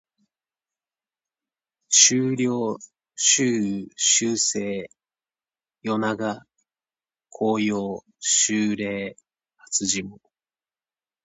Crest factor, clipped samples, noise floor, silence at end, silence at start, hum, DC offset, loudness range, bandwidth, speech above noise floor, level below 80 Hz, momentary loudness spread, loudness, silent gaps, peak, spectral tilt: 24 dB; under 0.1%; under -90 dBFS; 1.1 s; 1.9 s; none; under 0.1%; 9 LU; 9.2 kHz; over 67 dB; -66 dBFS; 16 LU; -21 LUFS; none; 0 dBFS; -2 dB/octave